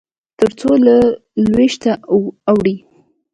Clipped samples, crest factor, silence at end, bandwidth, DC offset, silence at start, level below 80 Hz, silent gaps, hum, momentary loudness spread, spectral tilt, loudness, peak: under 0.1%; 14 dB; 0.55 s; 10.5 kHz; under 0.1%; 0.4 s; -46 dBFS; none; none; 8 LU; -6.5 dB/octave; -14 LUFS; 0 dBFS